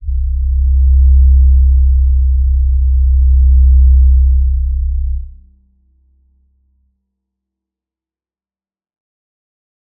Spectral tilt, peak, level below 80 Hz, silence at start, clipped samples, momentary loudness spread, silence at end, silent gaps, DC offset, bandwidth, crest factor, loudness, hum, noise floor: -18 dB/octave; -2 dBFS; -12 dBFS; 0 s; under 0.1%; 9 LU; 4.7 s; none; under 0.1%; 0.2 kHz; 10 dB; -12 LUFS; none; under -90 dBFS